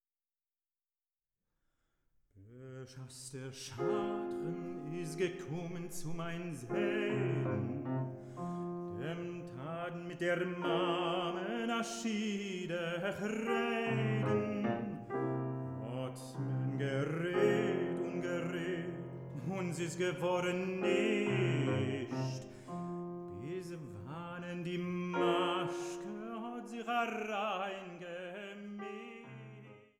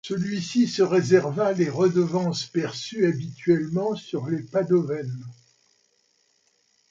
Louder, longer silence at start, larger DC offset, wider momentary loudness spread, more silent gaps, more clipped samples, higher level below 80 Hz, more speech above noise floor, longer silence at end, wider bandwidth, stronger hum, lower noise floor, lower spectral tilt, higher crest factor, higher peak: second, -37 LUFS vs -24 LUFS; first, 2.35 s vs 0.05 s; neither; first, 13 LU vs 10 LU; neither; neither; about the same, -70 dBFS vs -68 dBFS; first, over 54 dB vs 44 dB; second, 0.15 s vs 1.55 s; first, 14 kHz vs 7.8 kHz; neither; first, under -90 dBFS vs -67 dBFS; about the same, -6 dB/octave vs -6.5 dB/octave; about the same, 20 dB vs 18 dB; second, -18 dBFS vs -6 dBFS